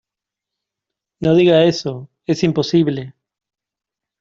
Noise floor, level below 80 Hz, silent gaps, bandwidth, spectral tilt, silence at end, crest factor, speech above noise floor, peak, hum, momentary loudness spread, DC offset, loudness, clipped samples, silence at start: -86 dBFS; -54 dBFS; none; 7.6 kHz; -6.5 dB/octave; 1.1 s; 16 dB; 70 dB; -2 dBFS; none; 16 LU; under 0.1%; -16 LUFS; under 0.1%; 1.2 s